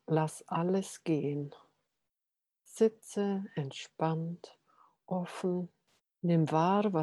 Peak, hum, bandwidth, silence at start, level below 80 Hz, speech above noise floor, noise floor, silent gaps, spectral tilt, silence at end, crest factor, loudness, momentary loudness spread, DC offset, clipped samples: -16 dBFS; none; 12.5 kHz; 0.1 s; -82 dBFS; 57 dB; -89 dBFS; none; -7 dB/octave; 0 s; 18 dB; -33 LUFS; 13 LU; under 0.1%; under 0.1%